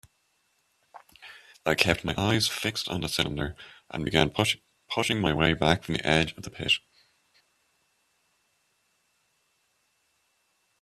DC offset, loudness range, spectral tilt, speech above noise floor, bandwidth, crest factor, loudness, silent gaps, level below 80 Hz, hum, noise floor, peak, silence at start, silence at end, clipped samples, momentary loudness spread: under 0.1%; 5 LU; -4 dB/octave; 45 dB; 14 kHz; 26 dB; -26 LUFS; none; -52 dBFS; none; -72 dBFS; -4 dBFS; 0.95 s; 4.05 s; under 0.1%; 13 LU